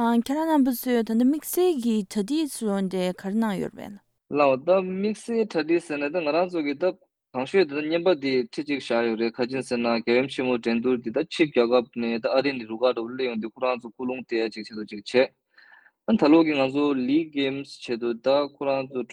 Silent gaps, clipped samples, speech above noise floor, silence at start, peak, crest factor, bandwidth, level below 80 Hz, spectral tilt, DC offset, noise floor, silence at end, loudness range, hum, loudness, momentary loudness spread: none; under 0.1%; 31 dB; 0 s; -8 dBFS; 18 dB; 16.5 kHz; -68 dBFS; -5.5 dB/octave; under 0.1%; -55 dBFS; 0 s; 3 LU; none; -25 LUFS; 8 LU